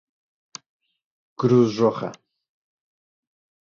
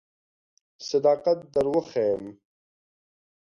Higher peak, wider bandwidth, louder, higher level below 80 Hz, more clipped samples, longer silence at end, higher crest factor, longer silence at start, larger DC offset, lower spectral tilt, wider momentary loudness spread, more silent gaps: first, -6 dBFS vs -10 dBFS; about the same, 7.4 kHz vs 7.4 kHz; first, -21 LUFS vs -25 LUFS; about the same, -66 dBFS vs -64 dBFS; neither; first, 1.45 s vs 1.1 s; about the same, 20 dB vs 18 dB; first, 1.4 s vs 0.8 s; neither; first, -7.5 dB/octave vs -5.5 dB/octave; first, 24 LU vs 12 LU; neither